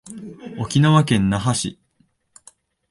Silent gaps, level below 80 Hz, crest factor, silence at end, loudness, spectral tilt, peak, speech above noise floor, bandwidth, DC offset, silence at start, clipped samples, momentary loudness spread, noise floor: none; -46 dBFS; 20 dB; 1.2 s; -19 LUFS; -5.5 dB/octave; -2 dBFS; 45 dB; 11.5 kHz; under 0.1%; 0.05 s; under 0.1%; 20 LU; -63 dBFS